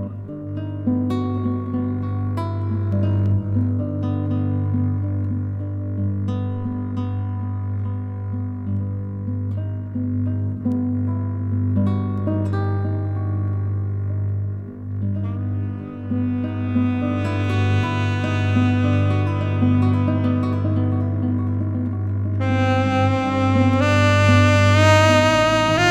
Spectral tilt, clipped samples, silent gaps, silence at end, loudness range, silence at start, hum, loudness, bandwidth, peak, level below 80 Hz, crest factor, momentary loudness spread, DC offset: -7 dB/octave; under 0.1%; none; 0 s; 8 LU; 0 s; 50 Hz at -35 dBFS; -21 LUFS; 8.2 kHz; -2 dBFS; -48 dBFS; 18 dB; 11 LU; under 0.1%